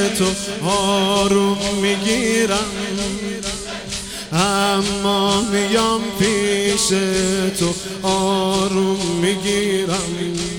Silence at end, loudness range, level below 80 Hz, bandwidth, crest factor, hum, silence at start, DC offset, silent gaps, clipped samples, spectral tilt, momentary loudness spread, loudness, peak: 0 s; 2 LU; -42 dBFS; 17.5 kHz; 16 dB; none; 0 s; 0.2%; none; under 0.1%; -3.5 dB/octave; 7 LU; -18 LUFS; -2 dBFS